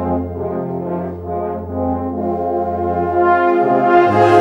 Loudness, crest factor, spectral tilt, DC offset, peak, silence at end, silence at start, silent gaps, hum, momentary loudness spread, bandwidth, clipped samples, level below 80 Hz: -17 LUFS; 16 dB; -8 dB/octave; under 0.1%; 0 dBFS; 0 s; 0 s; none; none; 11 LU; 7.6 kHz; under 0.1%; -42 dBFS